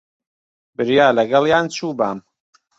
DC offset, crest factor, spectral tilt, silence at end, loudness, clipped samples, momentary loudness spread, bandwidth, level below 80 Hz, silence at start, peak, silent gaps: under 0.1%; 18 dB; -5 dB/octave; 0.6 s; -17 LUFS; under 0.1%; 13 LU; 8 kHz; -58 dBFS; 0.8 s; -2 dBFS; none